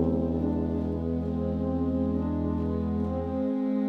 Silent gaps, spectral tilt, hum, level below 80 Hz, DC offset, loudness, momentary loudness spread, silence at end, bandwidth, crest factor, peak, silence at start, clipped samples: none; -11 dB/octave; none; -40 dBFS; under 0.1%; -29 LUFS; 2 LU; 0 s; 4.9 kHz; 14 dB; -14 dBFS; 0 s; under 0.1%